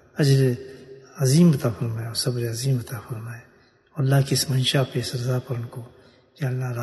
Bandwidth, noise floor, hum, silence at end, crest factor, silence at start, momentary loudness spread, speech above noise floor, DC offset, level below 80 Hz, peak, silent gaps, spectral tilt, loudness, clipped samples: 12.5 kHz; -43 dBFS; none; 0 s; 16 dB; 0.15 s; 18 LU; 21 dB; under 0.1%; -58 dBFS; -6 dBFS; none; -5.5 dB/octave; -23 LUFS; under 0.1%